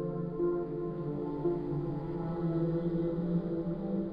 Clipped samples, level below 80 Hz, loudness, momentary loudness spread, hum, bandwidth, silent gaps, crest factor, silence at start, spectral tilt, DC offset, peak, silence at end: under 0.1%; -52 dBFS; -34 LUFS; 5 LU; none; 5 kHz; none; 12 dB; 0 s; -12 dB/octave; under 0.1%; -20 dBFS; 0 s